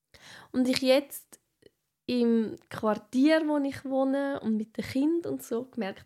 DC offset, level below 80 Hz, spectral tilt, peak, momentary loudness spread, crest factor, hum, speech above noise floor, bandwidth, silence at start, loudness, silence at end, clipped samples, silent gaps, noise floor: under 0.1%; -70 dBFS; -5 dB/octave; -6 dBFS; 11 LU; 22 dB; none; 36 dB; 15.5 kHz; 0.25 s; -28 LUFS; 0 s; under 0.1%; none; -63 dBFS